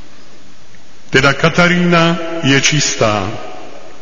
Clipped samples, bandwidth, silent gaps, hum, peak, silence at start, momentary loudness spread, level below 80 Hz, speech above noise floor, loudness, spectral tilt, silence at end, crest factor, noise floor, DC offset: under 0.1%; 7.6 kHz; none; none; 0 dBFS; 1.15 s; 15 LU; -40 dBFS; 31 dB; -12 LUFS; -4 dB/octave; 0.1 s; 16 dB; -44 dBFS; 7%